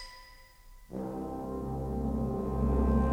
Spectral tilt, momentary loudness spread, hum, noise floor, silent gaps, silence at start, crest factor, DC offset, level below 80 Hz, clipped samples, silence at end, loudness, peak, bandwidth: -9 dB/octave; 18 LU; none; -54 dBFS; none; 0 s; 18 dB; under 0.1%; -36 dBFS; under 0.1%; 0 s; -33 LUFS; -14 dBFS; 9.4 kHz